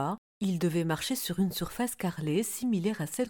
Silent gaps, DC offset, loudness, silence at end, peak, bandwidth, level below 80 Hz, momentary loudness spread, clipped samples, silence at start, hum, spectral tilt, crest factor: 0.18-0.40 s; under 0.1%; -31 LUFS; 0 s; -18 dBFS; 19 kHz; -58 dBFS; 4 LU; under 0.1%; 0 s; none; -5 dB/octave; 14 dB